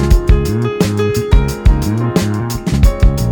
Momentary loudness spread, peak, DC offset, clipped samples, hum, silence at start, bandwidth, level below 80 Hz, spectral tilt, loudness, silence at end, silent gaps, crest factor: 4 LU; 0 dBFS; under 0.1%; under 0.1%; none; 0 s; over 20 kHz; -14 dBFS; -6.5 dB/octave; -14 LUFS; 0 s; none; 12 dB